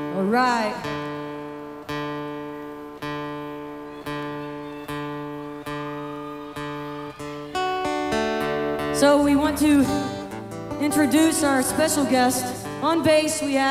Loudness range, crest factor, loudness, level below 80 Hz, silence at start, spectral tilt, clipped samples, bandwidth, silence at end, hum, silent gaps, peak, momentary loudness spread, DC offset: 12 LU; 18 dB; -23 LUFS; -50 dBFS; 0 s; -4 dB/octave; under 0.1%; 16 kHz; 0 s; none; none; -6 dBFS; 16 LU; under 0.1%